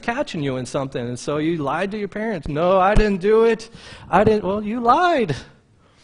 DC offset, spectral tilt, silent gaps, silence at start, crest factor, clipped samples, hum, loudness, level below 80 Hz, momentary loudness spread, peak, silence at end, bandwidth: under 0.1%; -6 dB/octave; none; 0 s; 18 dB; under 0.1%; none; -20 LUFS; -32 dBFS; 10 LU; 0 dBFS; 0.6 s; 10.5 kHz